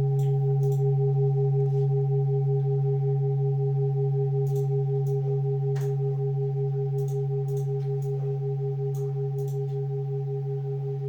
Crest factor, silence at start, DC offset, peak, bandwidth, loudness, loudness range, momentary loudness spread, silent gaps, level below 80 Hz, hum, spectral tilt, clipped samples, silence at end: 8 dB; 0 s; under 0.1%; -18 dBFS; 2 kHz; -26 LUFS; 4 LU; 6 LU; none; -66 dBFS; none; -11 dB/octave; under 0.1%; 0 s